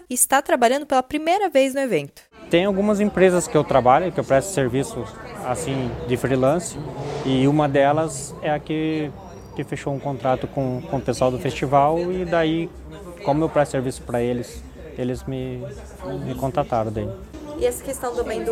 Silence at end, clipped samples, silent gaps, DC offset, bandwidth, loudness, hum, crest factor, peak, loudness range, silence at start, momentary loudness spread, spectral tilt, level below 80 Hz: 0 s; under 0.1%; none; under 0.1%; 16.5 kHz; -22 LUFS; none; 20 dB; -2 dBFS; 7 LU; 0 s; 15 LU; -5 dB/octave; -44 dBFS